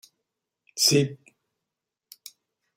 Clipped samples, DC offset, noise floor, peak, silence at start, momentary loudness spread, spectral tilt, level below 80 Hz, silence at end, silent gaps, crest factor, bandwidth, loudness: under 0.1%; under 0.1%; -86 dBFS; -6 dBFS; 0.75 s; 26 LU; -3.5 dB/octave; -68 dBFS; 1.6 s; none; 24 dB; 16 kHz; -22 LUFS